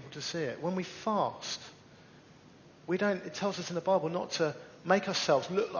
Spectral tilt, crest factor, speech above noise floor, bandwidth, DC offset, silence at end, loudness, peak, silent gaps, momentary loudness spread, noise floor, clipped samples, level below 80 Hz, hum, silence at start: -4.5 dB/octave; 22 dB; 25 dB; 7.2 kHz; under 0.1%; 0 s; -32 LUFS; -12 dBFS; none; 10 LU; -57 dBFS; under 0.1%; -72 dBFS; none; 0 s